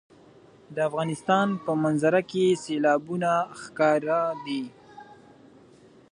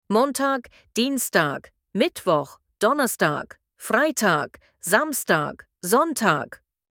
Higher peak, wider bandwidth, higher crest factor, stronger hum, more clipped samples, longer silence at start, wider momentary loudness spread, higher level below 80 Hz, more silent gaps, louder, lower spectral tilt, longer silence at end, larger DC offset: second, -8 dBFS vs -2 dBFS; second, 11 kHz vs 19 kHz; about the same, 18 dB vs 20 dB; neither; neither; first, 0.7 s vs 0.1 s; second, 9 LU vs 12 LU; second, -72 dBFS vs -66 dBFS; neither; about the same, -25 LUFS vs -23 LUFS; first, -6 dB/octave vs -3.5 dB/octave; first, 1 s vs 0.35 s; neither